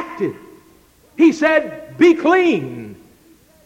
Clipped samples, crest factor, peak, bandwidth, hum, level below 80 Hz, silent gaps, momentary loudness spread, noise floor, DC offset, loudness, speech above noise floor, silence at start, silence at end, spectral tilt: under 0.1%; 16 dB; -2 dBFS; 8.4 kHz; none; -58 dBFS; none; 20 LU; -51 dBFS; under 0.1%; -15 LUFS; 36 dB; 0 s; 0.7 s; -5.5 dB/octave